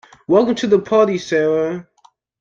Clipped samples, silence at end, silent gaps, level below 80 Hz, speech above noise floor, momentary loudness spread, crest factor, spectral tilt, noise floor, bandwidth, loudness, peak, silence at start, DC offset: under 0.1%; 0.6 s; none; -58 dBFS; 39 dB; 7 LU; 16 dB; -6 dB/octave; -55 dBFS; 7.6 kHz; -16 LUFS; -2 dBFS; 0.3 s; under 0.1%